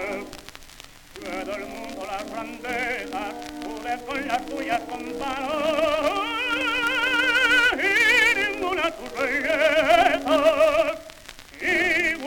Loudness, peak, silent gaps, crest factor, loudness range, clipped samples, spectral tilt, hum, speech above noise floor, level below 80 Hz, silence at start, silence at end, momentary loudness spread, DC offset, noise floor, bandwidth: -22 LUFS; -4 dBFS; none; 18 dB; 12 LU; under 0.1%; -2.5 dB/octave; none; 22 dB; -50 dBFS; 0 s; 0 s; 16 LU; under 0.1%; -46 dBFS; over 20 kHz